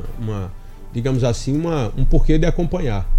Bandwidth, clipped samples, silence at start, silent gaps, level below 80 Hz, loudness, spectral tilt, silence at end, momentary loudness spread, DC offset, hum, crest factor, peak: 8.8 kHz; under 0.1%; 0 s; none; -20 dBFS; -21 LUFS; -7 dB/octave; 0 s; 10 LU; under 0.1%; none; 14 dB; -2 dBFS